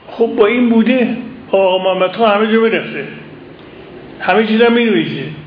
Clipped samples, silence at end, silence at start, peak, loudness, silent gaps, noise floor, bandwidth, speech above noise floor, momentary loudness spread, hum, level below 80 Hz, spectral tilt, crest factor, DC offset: under 0.1%; 0 s; 0.1 s; 0 dBFS; -13 LUFS; none; -35 dBFS; 5.2 kHz; 22 dB; 14 LU; none; -54 dBFS; -9 dB/octave; 14 dB; under 0.1%